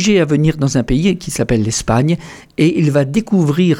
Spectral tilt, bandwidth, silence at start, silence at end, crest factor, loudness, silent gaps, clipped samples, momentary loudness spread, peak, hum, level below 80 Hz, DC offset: -6 dB/octave; 15.5 kHz; 0 s; 0 s; 12 dB; -15 LUFS; none; under 0.1%; 5 LU; -2 dBFS; none; -34 dBFS; under 0.1%